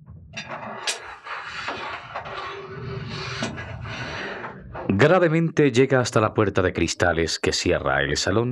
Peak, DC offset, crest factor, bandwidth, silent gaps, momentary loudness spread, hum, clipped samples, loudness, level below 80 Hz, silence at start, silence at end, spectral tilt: -4 dBFS; under 0.1%; 20 dB; 13 kHz; none; 15 LU; none; under 0.1%; -23 LUFS; -48 dBFS; 0.1 s; 0 s; -5 dB/octave